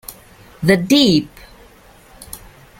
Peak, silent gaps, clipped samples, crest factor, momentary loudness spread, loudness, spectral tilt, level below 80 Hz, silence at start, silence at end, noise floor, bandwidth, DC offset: 0 dBFS; none; under 0.1%; 18 dB; 24 LU; -14 LUFS; -5 dB/octave; -46 dBFS; 0.1 s; 0.45 s; -46 dBFS; 17 kHz; under 0.1%